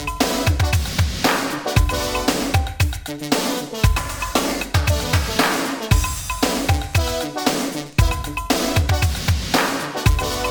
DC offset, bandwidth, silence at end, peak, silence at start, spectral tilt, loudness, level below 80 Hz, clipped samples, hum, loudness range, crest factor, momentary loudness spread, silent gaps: under 0.1%; over 20 kHz; 0 s; -2 dBFS; 0 s; -4.5 dB/octave; -20 LUFS; -26 dBFS; under 0.1%; none; 1 LU; 18 dB; 4 LU; none